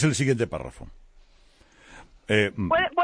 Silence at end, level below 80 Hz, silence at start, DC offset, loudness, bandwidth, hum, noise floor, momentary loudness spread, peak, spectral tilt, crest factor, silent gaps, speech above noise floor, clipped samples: 0 s; -50 dBFS; 0 s; under 0.1%; -24 LUFS; 10.5 kHz; none; -56 dBFS; 20 LU; -6 dBFS; -5 dB/octave; 20 dB; none; 32 dB; under 0.1%